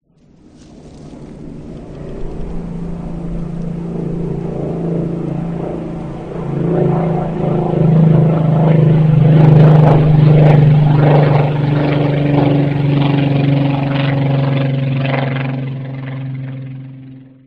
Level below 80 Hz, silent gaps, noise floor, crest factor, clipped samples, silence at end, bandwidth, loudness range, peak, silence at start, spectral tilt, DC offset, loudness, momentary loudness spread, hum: -34 dBFS; none; -46 dBFS; 14 dB; 0.1%; 0.25 s; 4.8 kHz; 15 LU; 0 dBFS; 0.85 s; -10 dB/octave; under 0.1%; -13 LUFS; 19 LU; none